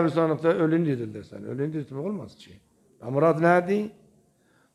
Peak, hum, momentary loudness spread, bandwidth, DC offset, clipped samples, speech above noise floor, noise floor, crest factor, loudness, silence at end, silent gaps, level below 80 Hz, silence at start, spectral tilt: -8 dBFS; none; 16 LU; 11 kHz; under 0.1%; under 0.1%; 39 dB; -64 dBFS; 18 dB; -25 LUFS; 0.85 s; none; -68 dBFS; 0 s; -8.5 dB/octave